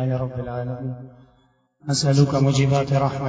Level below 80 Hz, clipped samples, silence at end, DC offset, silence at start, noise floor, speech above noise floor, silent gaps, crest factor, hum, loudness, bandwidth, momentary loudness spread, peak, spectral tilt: -48 dBFS; under 0.1%; 0 s; under 0.1%; 0 s; -61 dBFS; 40 dB; none; 18 dB; none; -21 LUFS; 8 kHz; 14 LU; -4 dBFS; -6 dB/octave